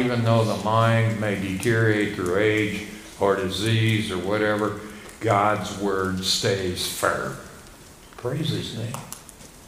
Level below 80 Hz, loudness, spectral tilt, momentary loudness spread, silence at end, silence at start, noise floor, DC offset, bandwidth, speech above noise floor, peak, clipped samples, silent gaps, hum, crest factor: -52 dBFS; -23 LUFS; -5 dB/octave; 14 LU; 0 s; 0 s; -46 dBFS; under 0.1%; 16 kHz; 23 dB; -4 dBFS; under 0.1%; none; none; 20 dB